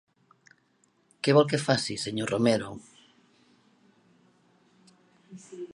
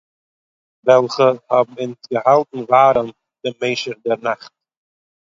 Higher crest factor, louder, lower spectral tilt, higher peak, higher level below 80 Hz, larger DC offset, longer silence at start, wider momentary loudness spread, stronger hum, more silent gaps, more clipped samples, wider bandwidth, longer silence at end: first, 24 dB vs 18 dB; second, -26 LUFS vs -17 LUFS; about the same, -5 dB/octave vs -5.5 dB/octave; second, -6 dBFS vs 0 dBFS; second, -68 dBFS vs -62 dBFS; neither; first, 1.25 s vs 0.85 s; first, 24 LU vs 15 LU; neither; neither; neither; first, 11.5 kHz vs 7.6 kHz; second, 0.1 s vs 0.95 s